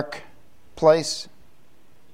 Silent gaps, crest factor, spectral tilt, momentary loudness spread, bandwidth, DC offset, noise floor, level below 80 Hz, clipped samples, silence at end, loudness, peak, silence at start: none; 22 dB; -4 dB/octave; 21 LU; 14.5 kHz; 0.8%; -59 dBFS; -58 dBFS; under 0.1%; 0.9 s; -21 LUFS; -4 dBFS; 0 s